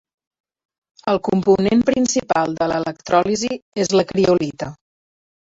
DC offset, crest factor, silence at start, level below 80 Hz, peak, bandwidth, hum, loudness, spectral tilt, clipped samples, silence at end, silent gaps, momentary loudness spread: under 0.1%; 18 dB; 1.05 s; -52 dBFS; -2 dBFS; 8 kHz; none; -18 LUFS; -5 dB/octave; under 0.1%; 0.85 s; 3.62-3.72 s; 9 LU